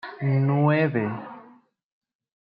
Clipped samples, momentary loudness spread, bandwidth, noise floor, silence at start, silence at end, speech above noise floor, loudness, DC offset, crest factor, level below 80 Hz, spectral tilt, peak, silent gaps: under 0.1%; 15 LU; 5 kHz; -55 dBFS; 0.05 s; 1.05 s; 33 dB; -23 LUFS; under 0.1%; 18 dB; -70 dBFS; -11.5 dB/octave; -8 dBFS; none